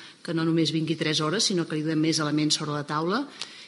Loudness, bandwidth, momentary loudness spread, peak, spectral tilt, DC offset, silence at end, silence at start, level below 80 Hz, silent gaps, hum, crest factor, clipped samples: -25 LUFS; 11.5 kHz; 5 LU; -10 dBFS; -4 dB/octave; under 0.1%; 0 s; 0 s; -78 dBFS; none; none; 16 dB; under 0.1%